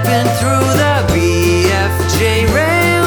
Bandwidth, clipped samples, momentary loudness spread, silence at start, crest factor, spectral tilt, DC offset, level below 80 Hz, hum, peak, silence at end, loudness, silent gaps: over 20 kHz; under 0.1%; 2 LU; 0 s; 12 dB; -5 dB/octave; under 0.1%; -28 dBFS; none; 0 dBFS; 0 s; -12 LUFS; none